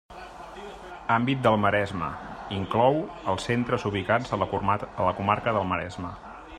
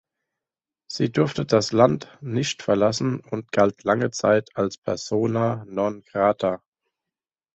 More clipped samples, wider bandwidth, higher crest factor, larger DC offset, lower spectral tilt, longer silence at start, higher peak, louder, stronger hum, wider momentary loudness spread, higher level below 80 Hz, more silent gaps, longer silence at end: neither; first, 12.5 kHz vs 8.2 kHz; about the same, 20 dB vs 20 dB; neither; about the same, -6.5 dB/octave vs -5.5 dB/octave; second, 0.1 s vs 0.9 s; second, -6 dBFS vs -2 dBFS; second, -26 LUFS vs -23 LUFS; neither; first, 18 LU vs 8 LU; first, -52 dBFS vs -58 dBFS; second, none vs 4.78-4.82 s; second, 0 s vs 1 s